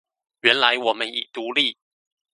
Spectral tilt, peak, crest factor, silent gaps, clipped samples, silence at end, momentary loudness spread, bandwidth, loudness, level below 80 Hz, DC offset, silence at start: -2 dB/octave; 0 dBFS; 24 dB; none; under 0.1%; 0.6 s; 9 LU; 11.5 kHz; -20 LUFS; -74 dBFS; under 0.1%; 0.45 s